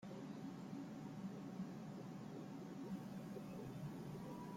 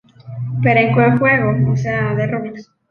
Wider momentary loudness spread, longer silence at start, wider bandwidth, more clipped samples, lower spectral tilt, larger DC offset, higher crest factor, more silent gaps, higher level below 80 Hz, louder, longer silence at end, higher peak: second, 2 LU vs 15 LU; second, 0 s vs 0.25 s; first, 16.5 kHz vs 6.8 kHz; neither; second, -7 dB/octave vs -8.5 dB/octave; neither; about the same, 12 dB vs 14 dB; neither; second, -78 dBFS vs -48 dBFS; second, -51 LUFS vs -15 LUFS; second, 0 s vs 0.25 s; second, -38 dBFS vs -2 dBFS